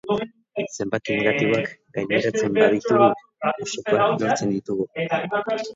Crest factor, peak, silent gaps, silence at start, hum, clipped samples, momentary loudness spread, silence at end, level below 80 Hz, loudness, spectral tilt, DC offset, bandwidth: 20 dB; -2 dBFS; none; 0.05 s; none; under 0.1%; 10 LU; 0 s; -62 dBFS; -22 LUFS; -5 dB/octave; under 0.1%; 7.8 kHz